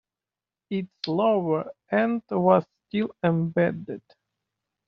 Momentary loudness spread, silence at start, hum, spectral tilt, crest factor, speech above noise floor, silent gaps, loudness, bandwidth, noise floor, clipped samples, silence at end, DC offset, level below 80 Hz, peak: 11 LU; 0.7 s; none; -6 dB/octave; 22 dB; over 66 dB; none; -25 LUFS; 6 kHz; under -90 dBFS; under 0.1%; 0.9 s; under 0.1%; -68 dBFS; -4 dBFS